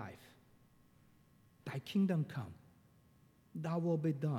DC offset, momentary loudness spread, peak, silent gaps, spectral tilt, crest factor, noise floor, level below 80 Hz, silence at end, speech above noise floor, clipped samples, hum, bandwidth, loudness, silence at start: under 0.1%; 18 LU; -24 dBFS; none; -8 dB/octave; 16 dB; -68 dBFS; -76 dBFS; 0 s; 31 dB; under 0.1%; none; 14 kHz; -38 LUFS; 0 s